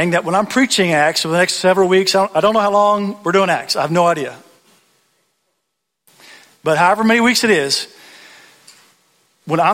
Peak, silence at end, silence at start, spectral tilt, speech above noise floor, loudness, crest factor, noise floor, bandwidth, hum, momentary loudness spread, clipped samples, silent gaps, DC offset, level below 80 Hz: -2 dBFS; 0 s; 0 s; -4 dB/octave; 60 dB; -14 LUFS; 16 dB; -74 dBFS; 16.5 kHz; none; 6 LU; under 0.1%; none; under 0.1%; -60 dBFS